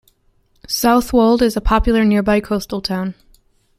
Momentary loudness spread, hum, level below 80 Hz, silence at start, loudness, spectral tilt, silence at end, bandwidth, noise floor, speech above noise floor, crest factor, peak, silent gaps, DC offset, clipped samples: 9 LU; none; -28 dBFS; 0.7 s; -16 LUFS; -5 dB/octave; 0.65 s; 16 kHz; -58 dBFS; 43 dB; 16 dB; -2 dBFS; none; under 0.1%; under 0.1%